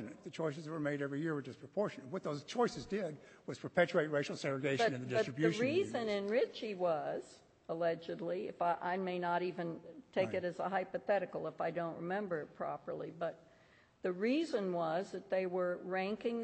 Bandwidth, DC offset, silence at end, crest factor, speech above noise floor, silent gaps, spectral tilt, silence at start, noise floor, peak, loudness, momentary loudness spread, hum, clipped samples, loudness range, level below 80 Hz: 8.4 kHz; under 0.1%; 0 s; 20 dB; 29 dB; none; -6 dB/octave; 0 s; -66 dBFS; -18 dBFS; -38 LUFS; 9 LU; none; under 0.1%; 4 LU; -76 dBFS